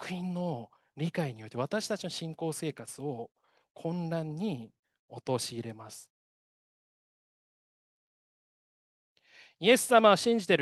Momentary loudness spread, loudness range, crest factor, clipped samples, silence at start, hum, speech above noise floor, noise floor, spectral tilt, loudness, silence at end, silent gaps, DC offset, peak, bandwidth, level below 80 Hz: 20 LU; 13 LU; 26 dB; under 0.1%; 0 s; none; over 60 dB; under -90 dBFS; -4.5 dB/octave; -30 LUFS; 0 s; 3.71-3.75 s, 4.79-4.83 s, 4.99-5.09 s, 6.10-9.16 s; under 0.1%; -8 dBFS; 12.5 kHz; -78 dBFS